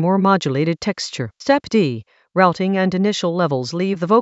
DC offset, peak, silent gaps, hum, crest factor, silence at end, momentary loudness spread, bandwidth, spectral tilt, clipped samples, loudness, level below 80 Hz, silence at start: under 0.1%; 0 dBFS; none; none; 18 dB; 0 s; 9 LU; 8 kHz; -6 dB/octave; under 0.1%; -19 LUFS; -58 dBFS; 0 s